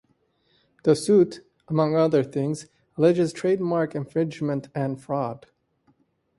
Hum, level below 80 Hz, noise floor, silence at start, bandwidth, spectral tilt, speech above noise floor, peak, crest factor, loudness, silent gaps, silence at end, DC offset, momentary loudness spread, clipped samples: none; -66 dBFS; -67 dBFS; 0.85 s; 11.5 kHz; -7 dB/octave; 44 dB; -6 dBFS; 18 dB; -24 LUFS; none; 1 s; under 0.1%; 10 LU; under 0.1%